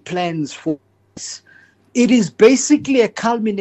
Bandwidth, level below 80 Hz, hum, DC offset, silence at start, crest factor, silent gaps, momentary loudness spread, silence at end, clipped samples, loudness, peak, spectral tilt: 8.6 kHz; -58 dBFS; none; under 0.1%; 0.05 s; 16 dB; none; 18 LU; 0 s; under 0.1%; -16 LUFS; -2 dBFS; -4.5 dB/octave